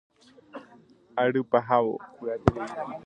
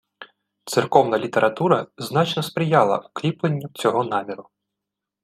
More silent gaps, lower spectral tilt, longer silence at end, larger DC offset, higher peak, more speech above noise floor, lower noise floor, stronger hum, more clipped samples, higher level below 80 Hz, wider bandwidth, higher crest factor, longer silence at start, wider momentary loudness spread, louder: neither; first, -8 dB/octave vs -5.5 dB/octave; second, 0.05 s vs 0.8 s; neither; about the same, 0 dBFS vs 0 dBFS; second, 29 dB vs 63 dB; second, -56 dBFS vs -84 dBFS; neither; neither; first, -50 dBFS vs -66 dBFS; second, 9.2 kHz vs 15.5 kHz; first, 28 dB vs 22 dB; first, 0.55 s vs 0.2 s; first, 22 LU vs 9 LU; second, -27 LUFS vs -21 LUFS